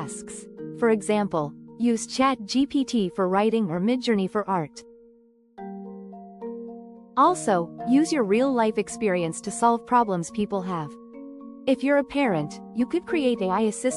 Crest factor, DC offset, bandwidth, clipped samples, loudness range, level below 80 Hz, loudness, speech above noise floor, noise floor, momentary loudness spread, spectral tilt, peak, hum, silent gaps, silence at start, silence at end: 18 dB; under 0.1%; 12 kHz; under 0.1%; 5 LU; -62 dBFS; -24 LUFS; 33 dB; -57 dBFS; 17 LU; -5 dB/octave; -8 dBFS; none; none; 0 s; 0 s